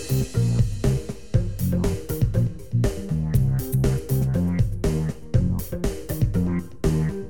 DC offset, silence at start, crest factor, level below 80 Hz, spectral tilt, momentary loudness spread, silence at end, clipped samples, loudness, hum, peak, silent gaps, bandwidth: 1%; 0 s; 16 dB; -32 dBFS; -7.5 dB/octave; 4 LU; 0 s; under 0.1%; -24 LUFS; none; -6 dBFS; none; 18.5 kHz